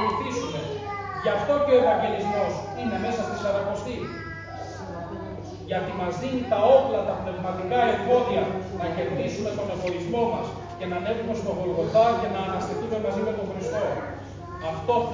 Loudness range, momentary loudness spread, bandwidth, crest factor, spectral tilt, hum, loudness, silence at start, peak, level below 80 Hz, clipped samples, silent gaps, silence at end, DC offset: 6 LU; 15 LU; 7.6 kHz; 20 dB; -6 dB/octave; none; -26 LUFS; 0 s; -6 dBFS; -48 dBFS; under 0.1%; none; 0 s; under 0.1%